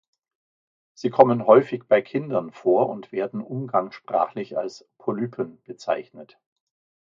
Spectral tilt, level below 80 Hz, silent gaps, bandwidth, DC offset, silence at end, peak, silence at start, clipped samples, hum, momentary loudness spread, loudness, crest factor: -7.5 dB/octave; -72 dBFS; none; 7.4 kHz; under 0.1%; 0.85 s; 0 dBFS; 1 s; under 0.1%; none; 14 LU; -23 LUFS; 24 dB